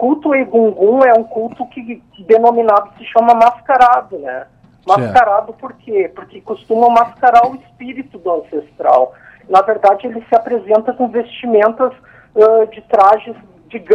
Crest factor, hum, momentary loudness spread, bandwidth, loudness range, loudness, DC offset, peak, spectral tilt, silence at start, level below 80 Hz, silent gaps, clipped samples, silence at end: 12 dB; none; 18 LU; 8.2 kHz; 3 LU; -12 LUFS; under 0.1%; 0 dBFS; -6.5 dB/octave; 0 s; -54 dBFS; none; under 0.1%; 0 s